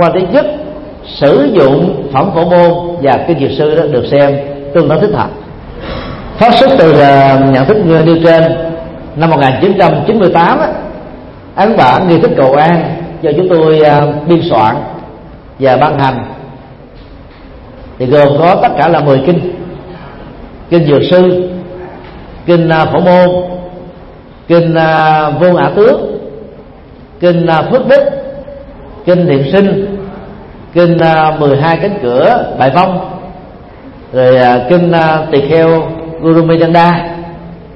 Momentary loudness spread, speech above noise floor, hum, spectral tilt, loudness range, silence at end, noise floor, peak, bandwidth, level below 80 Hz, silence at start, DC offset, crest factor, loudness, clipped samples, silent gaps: 19 LU; 26 dB; none; -9 dB/octave; 4 LU; 0 s; -33 dBFS; 0 dBFS; 5.8 kHz; -36 dBFS; 0 s; under 0.1%; 10 dB; -8 LUFS; 0.5%; none